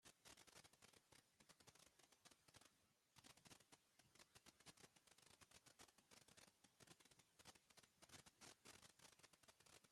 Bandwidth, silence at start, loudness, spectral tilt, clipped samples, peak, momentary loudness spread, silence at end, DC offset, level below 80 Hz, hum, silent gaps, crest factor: 16 kHz; 0 s; -68 LUFS; -2 dB/octave; under 0.1%; -50 dBFS; 3 LU; 0 s; under 0.1%; under -90 dBFS; none; none; 22 dB